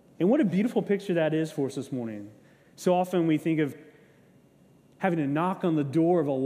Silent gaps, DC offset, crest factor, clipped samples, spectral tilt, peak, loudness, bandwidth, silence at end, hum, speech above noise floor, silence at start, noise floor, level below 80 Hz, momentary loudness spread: none; under 0.1%; 16 dB; under 0.1%; -7.5 dB/octave; -10 dBFS; -27 LUFS; 15 kHz; 0 s; none; 33 dB; 0.2 s; -59 dBFS; -74 dBFS; 9 LU